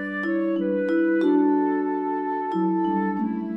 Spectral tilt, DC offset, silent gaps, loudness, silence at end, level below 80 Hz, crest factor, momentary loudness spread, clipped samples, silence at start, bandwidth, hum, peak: -9 dB/octave; under 0.1%; none; -23 LUFS; 0 s; -76 dBFS; 12 dB; 6 LU; under 0.1%; 0 s; 5.4 kHz; none; -10 dBFS